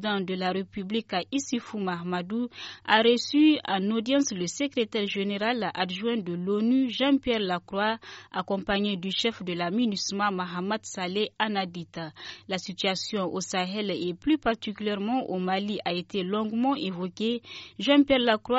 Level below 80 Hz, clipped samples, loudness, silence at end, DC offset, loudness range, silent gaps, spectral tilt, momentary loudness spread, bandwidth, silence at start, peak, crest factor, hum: -60 dBFS; under 0.1%; -27 LUFS; 0 s; under 0.1%; 5 LU; none; -3 dB/octave; 10 LU; 8 kHz; 0 s; -6 dBFS; 22 dB; none